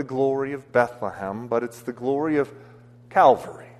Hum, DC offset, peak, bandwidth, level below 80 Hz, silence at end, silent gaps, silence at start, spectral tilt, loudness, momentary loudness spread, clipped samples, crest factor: none; under 0.1%; -4 dBFS; 13.5 kHz; -64 dBFS; 0.1 s; none; 0 s; -6.5 dB/octave; -23 LUFS; 13 LU; under 0.1%; 20 dB